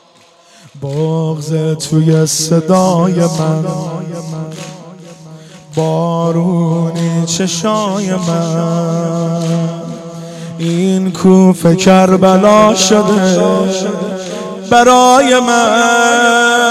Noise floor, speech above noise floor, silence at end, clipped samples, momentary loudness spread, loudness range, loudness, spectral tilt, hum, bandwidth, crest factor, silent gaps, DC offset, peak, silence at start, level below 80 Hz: -45 dBFS; 35 dB; 0 s; under 0.1%; 15 LU; 8 LU; -11 LUFS; -5 dB/octave; none; 14 kHz; 12 dB; none; under 0.1%; 0 dBFS; 0.75 s; -50 dBFS